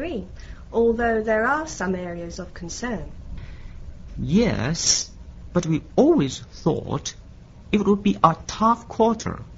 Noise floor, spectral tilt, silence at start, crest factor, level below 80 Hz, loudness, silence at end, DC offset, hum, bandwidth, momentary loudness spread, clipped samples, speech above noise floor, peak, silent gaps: -43 dBFS; -4.5 dB/octave; 0 s; 22 dB; -40 dBFS; -22 LUFS; 0 s; under 0.1%; none; 8 kHz; 20 LU; under 0.1%; 21 dB; 0 dBFS; none